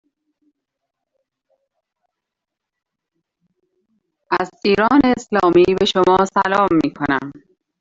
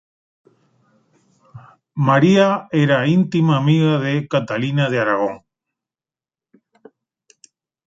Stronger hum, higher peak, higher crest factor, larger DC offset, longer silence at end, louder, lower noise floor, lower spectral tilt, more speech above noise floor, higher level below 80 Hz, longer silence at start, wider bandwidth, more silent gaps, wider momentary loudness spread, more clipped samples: neither; about the same, -2 dBFS vs -2 dBFS; about the same, 18 dB vs 18 dB; neither; second, 0.5 s vs 2.5 s; about the same, -16 LUFS vs -17 LUFS; second, -82 dBFS vs under -90 dBFS; second, -5.5 dB/octave vs -7.5 dB/octave; second, 67 dB vs over 74 dB; first, -50 dBFS vs -62 dBFS; first, 4.3 s vs 1.55 s; about the same, 7.8 kHz vs 7.8 kHz; neither; about the same, 8 LU vs 8 LU; neither